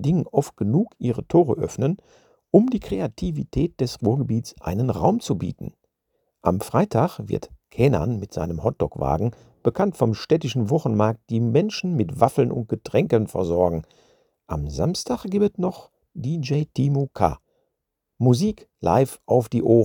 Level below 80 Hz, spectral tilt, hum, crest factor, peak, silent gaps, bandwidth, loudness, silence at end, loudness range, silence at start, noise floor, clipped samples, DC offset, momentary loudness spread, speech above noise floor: -46 dBFS; -7.5 dB/octave; none; 22 dB; 0 dBFS; none; 19 kHz; -23 LUFS; 0 s; 3 LU; 0 s; -80 dBFS; under 0.1%; under 0.1%; 9 LU; 58 dB